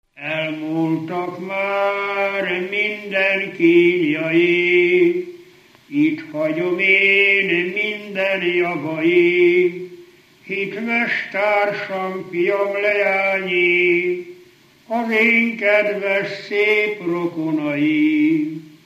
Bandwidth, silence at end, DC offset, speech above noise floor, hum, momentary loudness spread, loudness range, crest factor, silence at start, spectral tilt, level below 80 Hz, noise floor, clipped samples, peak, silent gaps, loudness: 7.6 kHz; 0.2 s; under 0.1%; 32 dB; none; 10 LU; 4 LU; 16 dB; 0.15 s; -6.5 dB/octave; -76 dBFS; -49 dBFS; under 0.1%; -4 dBFS; none; -18 LUFS